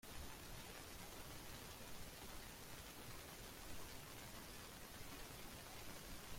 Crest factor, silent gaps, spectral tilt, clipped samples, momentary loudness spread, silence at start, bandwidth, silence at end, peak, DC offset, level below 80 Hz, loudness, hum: 16 dB; none; -3 dB/octave; under 0.1%; 1 LU; 0.05 s; 16.5 kHz; 0 s; -38 dBFS; under 0.1%; -62 dBFS; -55 LUFS; none